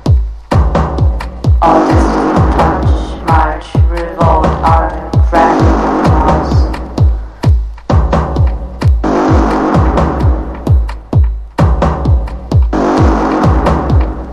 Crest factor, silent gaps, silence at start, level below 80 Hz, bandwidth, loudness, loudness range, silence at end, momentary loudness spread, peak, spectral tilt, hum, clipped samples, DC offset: 10 dB; none; 0 s; -14 dBFS; 9.8 kHz; -12 LUFS; 2 LU; 0 s; 5 LU; 0 dBFS; -8 dB/octave; none; under 0.1%; under 0.1%